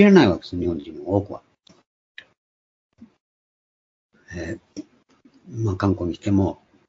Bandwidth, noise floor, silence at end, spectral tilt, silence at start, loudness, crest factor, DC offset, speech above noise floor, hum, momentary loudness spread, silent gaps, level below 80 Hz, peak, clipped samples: 7.6 kHz; -57 dBFS; 0.35 s; -7.5 dB/octave; 0 s; -22 LUFS; 22 dB; under 0.1%; 37 dB; none; 20 LU; 1.86-2.15 s, 2.37-2.90 s, 3.21-4.09 s; -52 dBFS; 0 dBFS; under 0.1%